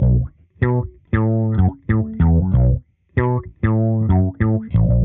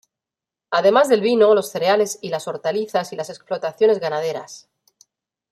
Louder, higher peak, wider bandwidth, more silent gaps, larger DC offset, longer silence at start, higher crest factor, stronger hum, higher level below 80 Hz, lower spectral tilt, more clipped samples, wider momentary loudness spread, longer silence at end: about the same, -19 LUFS vs -19 LUFS; about the same, -2 dBFS vs -2 dBFS; second, 3.7 kHz vs 15 kHz; neither; neither; second, 0 s vs 0.7 s; about the same, 14 dB vs 18 dB; neither; first, -26 dBFS vs -72 dBFS; first, -10.5 dB/octave vs -4 dB/octave; neither; second, 6 LU vs 13 LU; second, 0 s vs 0.95 s